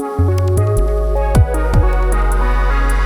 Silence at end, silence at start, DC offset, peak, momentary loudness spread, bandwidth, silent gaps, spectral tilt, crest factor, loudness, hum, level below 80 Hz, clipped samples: 0 s; 0 s; under 0.1%; 0 dBFS; 3 LU; 13 kHz; none; -7 dB/octave; 12 dB; -16 LUFS; none; -14 dBFS; under 0.1%